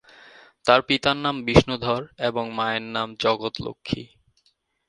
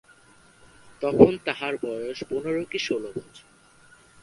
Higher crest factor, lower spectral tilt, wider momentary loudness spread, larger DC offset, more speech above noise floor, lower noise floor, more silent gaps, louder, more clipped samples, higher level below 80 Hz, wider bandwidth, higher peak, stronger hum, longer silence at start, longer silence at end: about the same, 24 dB vs 26 dB; about the same, -5.5 dB/octave vs -6 dB/octave; about the same, 12 LU vs 14 LU; neither; first, 44 dB vs 31 dB; first, -67 dBFS vs -55 dBFS; neither; about the same, -23 LUFS vs -24 LUFS; neither; first, -44 dBFS vs -54 dBFS; about the same, 10.5 kHz vs 11.5 kHz; about the same, 0 dBFS vs 0 dBFS; neither; second, 0.65 s vs 1 s; about the same, 0.85 s vs 0.85 s